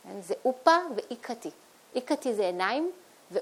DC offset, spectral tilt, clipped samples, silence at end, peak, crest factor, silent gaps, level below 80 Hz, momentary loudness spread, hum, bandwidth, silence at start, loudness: under 0.1%; -3.5 dB/octave; under 0.1%; 0 s; -6 dBFS; 22 dB; none; -84 dBFS; 15 LU; none; 16.5 kHz; 0.05 s; -29 LUFS